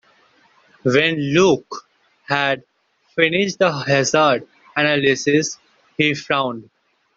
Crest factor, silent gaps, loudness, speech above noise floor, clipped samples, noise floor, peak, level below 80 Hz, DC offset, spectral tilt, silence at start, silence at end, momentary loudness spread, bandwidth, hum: 18 dB; none; -18 LUFS; 38 dB; under 0.1%; -56 dBFS; 0 dBFS; -60 dBFS; under 0.1%; -4 dB/octave; 0.85 s; 0.55 s; 12 LU; 7.8 kHz; none